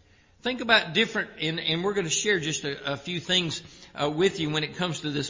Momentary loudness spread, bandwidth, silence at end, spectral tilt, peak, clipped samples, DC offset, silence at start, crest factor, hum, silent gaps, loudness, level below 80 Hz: 10 LU; 7.8 kHz; 0 s; -3 dB/octave; -4 dBFS; under 0.1%; under 0.1%; 0.45 s; 24 dB; none; none; -26 LUFS; -60 dBFS